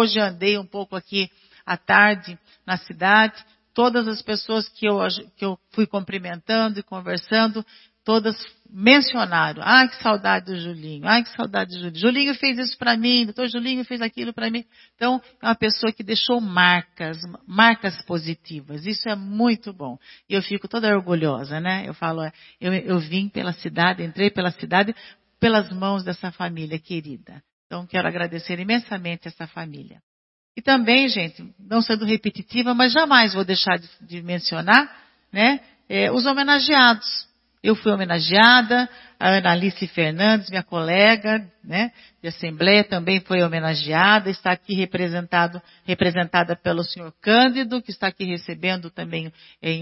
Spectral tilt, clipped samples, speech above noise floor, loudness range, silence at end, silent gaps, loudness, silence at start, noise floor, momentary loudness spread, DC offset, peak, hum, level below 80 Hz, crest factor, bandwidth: -7.5 dB/octave; under 0.1%; over 69 dB; 7 LU; 0 s; 27.53-27.70 s, 30.03-30.55 s; -20 LUFS; 0 s; under -90 dBFS; 16 LU; under 0.1%; 0 dBFS; none; -62 dBFS; 22 dB; 6 kHz